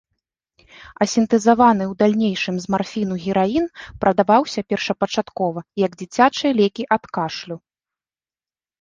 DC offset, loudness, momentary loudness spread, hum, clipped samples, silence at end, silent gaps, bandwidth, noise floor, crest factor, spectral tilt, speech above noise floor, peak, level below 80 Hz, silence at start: under 0.1%; -19 LUFS; 9 LU; none; under 0.1%; 1.25 s; none; 9.4 kHz; under -90 dBFS; 18 dB; -5.5 dB/octave; over 71 dB; -2 dBFS; -54 dBFS; 0.85 s